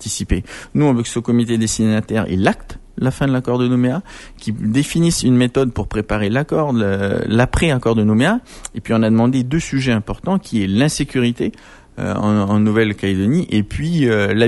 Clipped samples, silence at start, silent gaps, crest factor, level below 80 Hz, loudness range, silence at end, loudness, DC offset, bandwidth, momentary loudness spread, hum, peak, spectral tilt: under 0.1%; 0 s; none; 16 dB; -34 dBFS; 2 LU; 0 s; -17 LUFS; under 0.1%; 12 kHz; 8 LU; none; -2 dBFS; -6 dB/octave